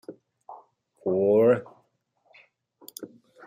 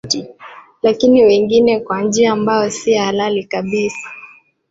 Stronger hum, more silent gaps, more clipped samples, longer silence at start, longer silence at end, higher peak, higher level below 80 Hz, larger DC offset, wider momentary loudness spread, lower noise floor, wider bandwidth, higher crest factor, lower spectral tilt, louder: neither; neither; neither; about the same, 0.1 s vs 0.05 s; about the same, 0.4 s vs 0.45 s; second, -10 dBFS vs -2 dBFS; second, -76 dBFS vs -54 dBFS; neither; first, 25 LU vs 12 LU; first, -70 dBFS vs -42 dBFS; first, 15.5 kHz vs 8 kHz; about the same, 18 dB vs 14 dB; first, -7 dB/octave vs -4.5 dB/octave; second, -23 LUFS vs -14 LUFS